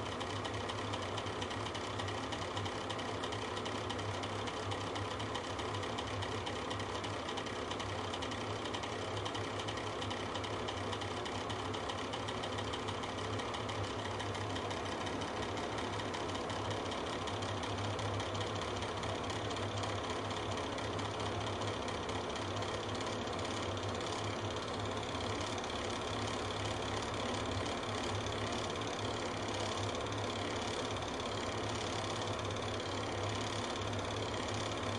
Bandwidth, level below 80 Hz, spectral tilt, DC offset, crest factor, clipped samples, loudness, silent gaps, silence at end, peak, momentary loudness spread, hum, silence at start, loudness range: 11.5 kHz; -58 dBFS; -4 dB/octave; under 0.1%; 14 dB; under 0.1%; -39 LUFS; none; 0 s; -24 dBFS; 2 LU; none; 0 s; 1 LU